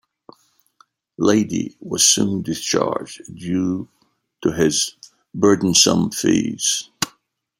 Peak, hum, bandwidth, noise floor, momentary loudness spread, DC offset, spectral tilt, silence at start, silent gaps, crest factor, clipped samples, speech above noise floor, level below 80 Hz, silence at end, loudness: 0 dBFS; none; 16.5 kHz; -61 dBFS; 13 LU; under 0.1%; -3 dB/octave; 1.2 s; none; 20 dB; under 0.1%; 42 dB; -56 dBFS; 0.5 s; -18 LUFS